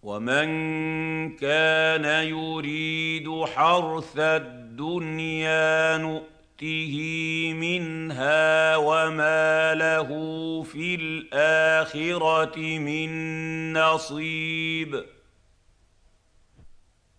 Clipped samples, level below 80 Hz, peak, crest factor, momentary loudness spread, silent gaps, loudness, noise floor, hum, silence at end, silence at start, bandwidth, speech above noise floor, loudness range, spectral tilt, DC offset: under 0.1%; -62 dBFS; -8 dBFS; 16 dB; 10 LU; none; -24 LUFS; -61 dBFS; none; 0.45 s; 0 s; 10 kHz; 36 dB; 5 LU; -4.5 dB/octave; under 0.1%